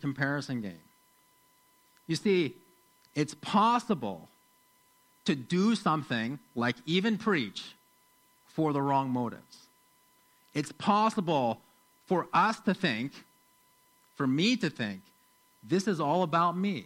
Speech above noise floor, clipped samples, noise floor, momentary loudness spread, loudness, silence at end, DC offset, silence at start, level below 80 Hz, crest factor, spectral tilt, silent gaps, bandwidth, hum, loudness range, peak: 36 dB; under 0.1%; -66 dBFS; 12 LU; -30 LUFS; 0 s; under 0.1%; 0 s; -76 dBFS; 18 dB; -5.5 dB/octave; none; 16.5 kHz; none; 3 LU; -14 dBFS